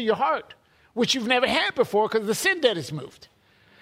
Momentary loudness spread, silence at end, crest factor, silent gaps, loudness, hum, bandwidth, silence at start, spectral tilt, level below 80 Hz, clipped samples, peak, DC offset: 14 LU; 0.7 s; 20 dB; none; -23 LUFS; none; 16 kHz; 0 s; -3 dB/octave; -62 dBFS; under 0.1%; -6 dBFS; under 0.1%